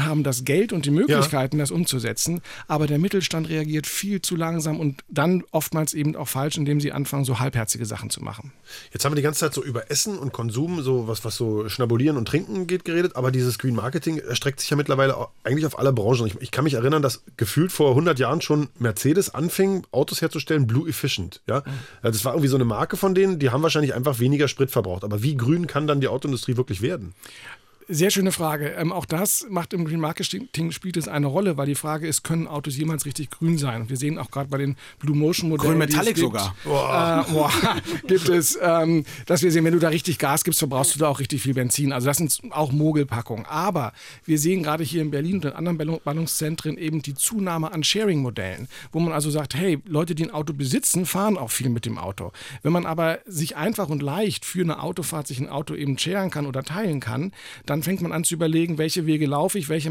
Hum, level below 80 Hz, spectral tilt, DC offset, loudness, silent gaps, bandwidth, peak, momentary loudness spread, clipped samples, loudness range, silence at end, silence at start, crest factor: none; -56 dBFS; -5 dB/octave; under 0.1%; -23 LUFS; none; 17 kHz; -8 dBFS; 8 LU; under 0.1%; 5 LU; 0 s; 0 s; 14 dB